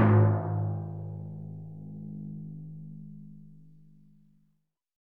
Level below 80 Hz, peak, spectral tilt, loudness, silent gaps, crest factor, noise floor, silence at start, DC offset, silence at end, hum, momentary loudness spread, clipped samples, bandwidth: -68 dBFS; -12 dBFS; -12.5 dB/octave; -32 LUFS; none; 20 dB; -75 dBFS; 0 s; 0.2%; 1.55 s; none; 22 LU; under 0.1%; 3.1 kHz